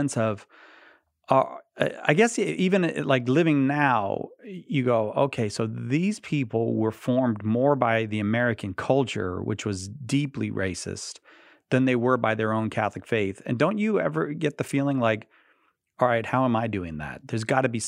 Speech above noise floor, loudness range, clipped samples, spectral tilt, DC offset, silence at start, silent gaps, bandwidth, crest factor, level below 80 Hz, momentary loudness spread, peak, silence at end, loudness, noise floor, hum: 42 dB; 4 LU; under 0.1%; -6 dB/octave; under 0.1%; 0 s; none; 13 kHz; 22 dB; -62 dBFS; 10 LU; -4 dBFS; 0 s; -25 LUFS; -67 dBFS; none